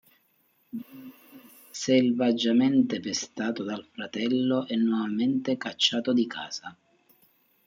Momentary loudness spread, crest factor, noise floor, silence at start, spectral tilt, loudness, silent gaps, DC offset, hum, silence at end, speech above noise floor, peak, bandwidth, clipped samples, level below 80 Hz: 18 LU; 20 dB; -68 dBFS; 0.75 s; -4.5 dB/octave; -26 LUFS; none; under 0.1%; none; 0.95 s; 42 dB; -8 dBFS; 16 kHz; under 0.1%; -76 dBFS